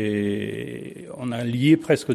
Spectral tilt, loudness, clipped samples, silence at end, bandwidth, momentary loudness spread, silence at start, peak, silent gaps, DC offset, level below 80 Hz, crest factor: -6.5 dB/octave; -23 LUFS; under 0.1%; 0 s; 13.5 kHz; 16 LU; 0 s; -6 dBFS; none; under 0.1%; -62 dBFS; 18 dB